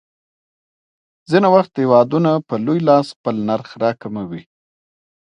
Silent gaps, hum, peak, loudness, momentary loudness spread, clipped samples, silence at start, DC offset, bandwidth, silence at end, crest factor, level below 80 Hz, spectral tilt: 3.16-3.24 s; none; 0 dBFS; -16 LUFS; 14 LU; under 0.1%; 1.3 s; under 0.1%; 10 kHz; 0.8 s; 18 dB; -64 dBFS; -8 dB/octave